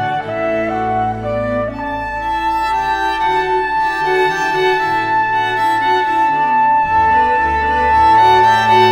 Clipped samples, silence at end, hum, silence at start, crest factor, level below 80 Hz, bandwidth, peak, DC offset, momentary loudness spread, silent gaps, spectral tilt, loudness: under 0.1%; 0 s; none; 0 s; 14 dB; -36 dBFS; 14 kHz; 0 dBFS; under 0.1%; 9 LU; none; -5 dB/octave; -14 LUFS